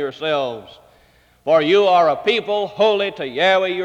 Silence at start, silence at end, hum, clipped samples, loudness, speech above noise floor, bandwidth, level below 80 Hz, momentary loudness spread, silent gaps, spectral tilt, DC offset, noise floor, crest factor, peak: 0 s; 0 s; none; under 0.1%; -17 LUFS; 37 dB; 8.8 kHz; -60 dBFS; 10 LU; none; -5 dB/octave; under 0.1%; -54 dBFS; 14 dB; -4 dBFS